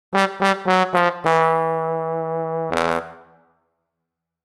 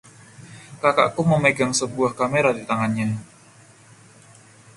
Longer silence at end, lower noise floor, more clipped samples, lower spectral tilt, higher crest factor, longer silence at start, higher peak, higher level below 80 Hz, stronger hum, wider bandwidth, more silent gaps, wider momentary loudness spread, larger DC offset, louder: second, 1.25 s vs 1.5 s; first, -81 dBFS vs -50 dBFS; neither; about the same, -5 dB/octave vs -5 dB/octave; about the same, 22 dB vs 20 dB; second, 0.1 s vs 0.4 s; about the same, 0 dBFS vs -2 dBFS; about the same, -60 dBFS vs -58 dBFS; neither; first, 13 kHz vs 11.5 kHz; neither; second, 7 LU vs 10 LU; neither; about the same, -20 LUFS vs -21 LUFS